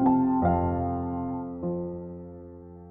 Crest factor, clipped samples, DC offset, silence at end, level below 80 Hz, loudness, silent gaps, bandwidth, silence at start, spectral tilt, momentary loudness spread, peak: 16 dB; under 0.1%; under 0.1%; 0 s; -46 dBFS; -28 LUFS; none; 3 kHz; 0 s; -13.5 dB/octave; 21 LU; -12 dBFS